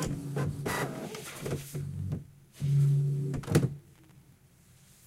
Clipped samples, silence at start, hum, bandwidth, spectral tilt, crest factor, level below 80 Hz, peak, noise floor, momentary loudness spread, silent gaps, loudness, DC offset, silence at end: under 0.1%; 0 s; none; 15.5 kHz; -6.5 dB/octave; 22 dB; -54 dBFS; -10 dBFS; -60 dBFS; 13 LU; none; -32 LUFS; under 0.1%; 0.9 s